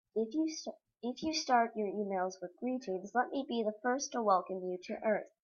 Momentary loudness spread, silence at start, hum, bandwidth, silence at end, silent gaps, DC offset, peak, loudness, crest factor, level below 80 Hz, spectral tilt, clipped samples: 10 LU; 0.15 s; none; 7.2 kHz; 0.15 s; none; under 0.1%; -16 dBFS; -35 LUFS; 18 dB; -78 dBFS; -4 dB/octave; under 0.1%